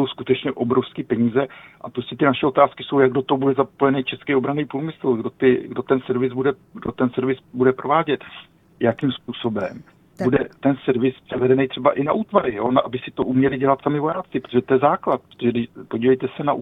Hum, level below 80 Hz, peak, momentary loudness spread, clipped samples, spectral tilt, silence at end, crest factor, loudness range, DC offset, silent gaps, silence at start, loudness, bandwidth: none; -56 dBFS; 0 dBFS; 9 LU; under 0.1%; -9 dB/octave; 0 s; 20 dB; 3 LU; under 0.1%; none; 0 s; -21 LUFS; 4 kHz